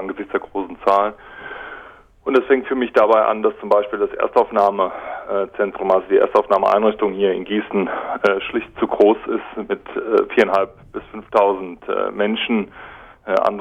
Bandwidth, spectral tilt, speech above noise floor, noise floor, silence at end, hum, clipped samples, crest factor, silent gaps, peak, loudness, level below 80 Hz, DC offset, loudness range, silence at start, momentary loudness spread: 8 kHz; -6.5 dB/octave; 24 dB; -42 dBFS; 0 s; none; under 0.1%; 16 dB; none; -2 dBFS; -19 LUFS; -54 dBFS; under 0.1%; 2 LU; 0 s; 16 LU